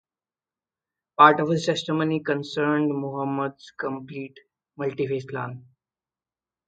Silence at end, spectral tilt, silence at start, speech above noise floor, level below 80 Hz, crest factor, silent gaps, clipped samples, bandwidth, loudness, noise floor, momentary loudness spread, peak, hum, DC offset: 1.05 s; -6 dB/octave; 1.2 s; over 66 dB; -70 dBFS; 26 dB; none; under 0.1%; 9 kHz; -24 LUFS; under -90 dBFS; 20 LU; 0 dBFS; none; under 0.1%